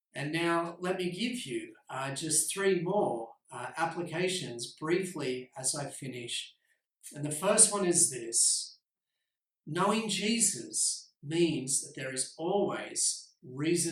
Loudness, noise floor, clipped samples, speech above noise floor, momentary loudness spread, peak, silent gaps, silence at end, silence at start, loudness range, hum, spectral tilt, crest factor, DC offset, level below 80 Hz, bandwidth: -30 LUFS; -88 dBFS; under 0.1%; 57 dB; 15 LU; -8 dBFS; none; 0 s; 0.15 s; 7 LU; none; -2.5 dB/octave; 24 dB; under 0.1%; -76 dBFS; 16 kHz